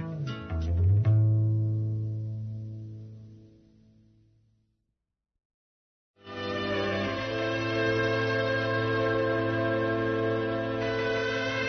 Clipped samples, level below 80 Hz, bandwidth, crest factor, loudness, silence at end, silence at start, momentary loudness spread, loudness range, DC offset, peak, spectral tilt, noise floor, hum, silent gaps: under 0.1%; -52 dBFS; 6.4 kHz; 14 dB; -28 LUFS; 0 s; 0 s; 13 LU; 15 LU; under 0.1%; -16 dBFS; -7 dB/octave; -84 dBFS; none; 5.45-6.14 s